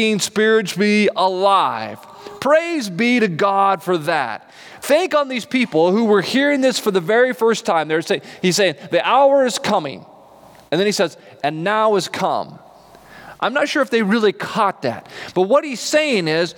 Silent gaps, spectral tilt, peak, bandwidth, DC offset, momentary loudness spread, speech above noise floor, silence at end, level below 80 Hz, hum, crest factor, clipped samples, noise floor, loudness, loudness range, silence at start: none; -4 dB/octave; -4 dBFS; 19.5 kHz; under 0.1%; 10 LU; 28 dB; 0.05 s; -68 dBFS; none; 14 dB; under 0.1%; -45 dBFS; -17 LUFS; 4 LU; 0 s